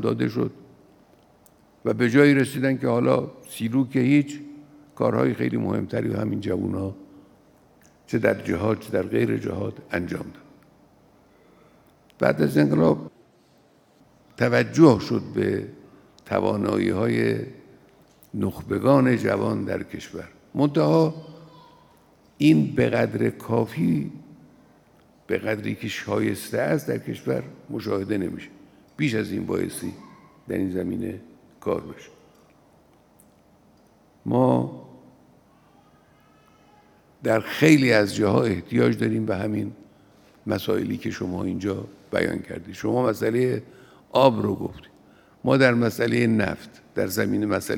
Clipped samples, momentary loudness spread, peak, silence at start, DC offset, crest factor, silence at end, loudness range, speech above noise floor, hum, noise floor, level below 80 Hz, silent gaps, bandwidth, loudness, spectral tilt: under 0.1%; 15 LU; -2 dBFS; 0 s; under 0.1%; 22 dB; 0 s; 7 LU; 36 dB; none; -58 dBFS; -62 dBFS; none; 18.5 kHz; -23 LUFS; -7 dB/octave